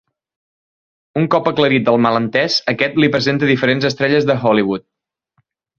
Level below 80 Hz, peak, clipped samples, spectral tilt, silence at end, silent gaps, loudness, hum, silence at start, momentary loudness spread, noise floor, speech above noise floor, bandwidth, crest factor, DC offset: -54 dBFS; 0 dBFS; under 0.1%; -6 dB/octave; 1 s; none; -15 LUFS; none; 1.15 s; 3 LU; -66 dBFS; 51 dB; 7.6 kHz; 16 dB; under 0.1%